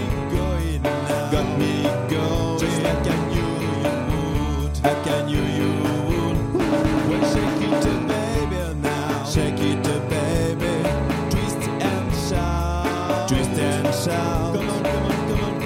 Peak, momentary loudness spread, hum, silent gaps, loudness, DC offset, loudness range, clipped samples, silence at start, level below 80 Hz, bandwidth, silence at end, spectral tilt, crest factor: -4 dBFS; 3 LU; none; none; -22 LUFS; under 0.1%; 1 LU; under 0.1%; 0 s; -32 dBFS; 16.5 kHz; 0 s; -6 dB/octave; 18 dB